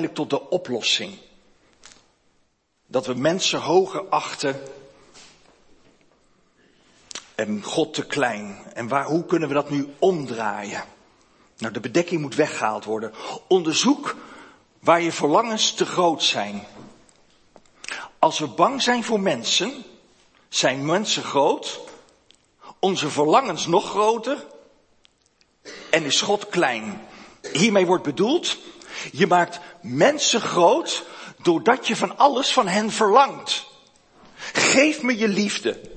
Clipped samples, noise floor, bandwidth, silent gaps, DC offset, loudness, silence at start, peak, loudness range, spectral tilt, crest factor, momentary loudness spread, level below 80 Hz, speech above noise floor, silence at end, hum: under 0.1%; -66 dBFS; 8.8 kHz; none; under 0.1%; -21 LUFS; 0 s; 0 dBFS; 7 LU; -3.5 dB/octave; 22 dB; 15 LU; -68 dBFS; 45 dB; 0 s; none